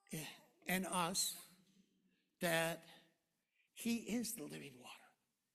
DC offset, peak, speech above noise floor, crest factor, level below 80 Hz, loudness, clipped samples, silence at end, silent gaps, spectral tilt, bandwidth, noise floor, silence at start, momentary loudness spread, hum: under 0.1%; -22 dBFS; 42 dB; 24 dB; -78 dBFS; -41 LUFS; under 0.1%; 0.5 s; none; -3 dB/octave; 15.5 kHz; -84 dBFS; 0.1 s; 20 LU; none